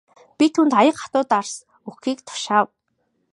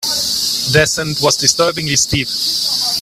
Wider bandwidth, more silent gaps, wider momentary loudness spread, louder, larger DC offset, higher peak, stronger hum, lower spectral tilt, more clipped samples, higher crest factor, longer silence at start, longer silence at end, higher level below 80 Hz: second, 11 kHz vs 16 kHz; neither; first, 15 LU vs 4 LU; second, -20 LUFS vs -13 LUFS; neither; about the same, -2 dBFS vs 0 dBFS; neither; first, -4 dB/octave vs -2 dB/octave; neither; about the same, 18 dB vs 16 dB; first, 0.4 s vs 0 s; first, 0.65 s vs 0 s; second, -72 dBFS vs -42 dBFS